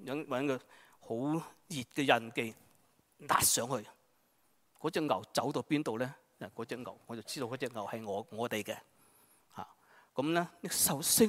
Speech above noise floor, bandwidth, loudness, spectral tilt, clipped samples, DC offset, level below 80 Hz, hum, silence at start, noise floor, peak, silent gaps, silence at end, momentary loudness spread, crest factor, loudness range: 39 dB; 16 kHz; -35 LUFS; -3 dB/octave; under 0.1%; under 0.1%; -72 dBFS; none; 0 s; -73 dBFS; -10 dBFS; none; 0 s; 17 LU; 26 dB; 7 LU